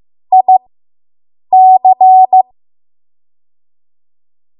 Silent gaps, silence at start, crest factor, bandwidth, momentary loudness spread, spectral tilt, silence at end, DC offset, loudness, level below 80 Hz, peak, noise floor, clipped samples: none; 0.3 s; 10 dB; 1 kHz; 6 LU; -9 dB/octave; 2.2 s; under 0.1%; -8 LUFS; -70 dBFS; 0 dBFS; under -90 dBFS; under 0.1%